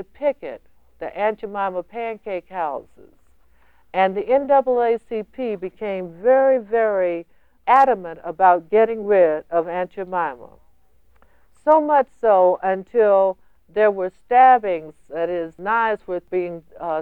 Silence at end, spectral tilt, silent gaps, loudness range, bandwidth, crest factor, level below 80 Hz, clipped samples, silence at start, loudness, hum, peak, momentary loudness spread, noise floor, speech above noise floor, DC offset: 0 s; -7.5 dB/octave; none; 7 LU; 4.9 kHz; 18 dB; -58 dBFS; under 0.1%; 0 s; -20 LUFS; none; -2 dBFS; 14 LU; -60 dBFS; 41 dB; 0.2%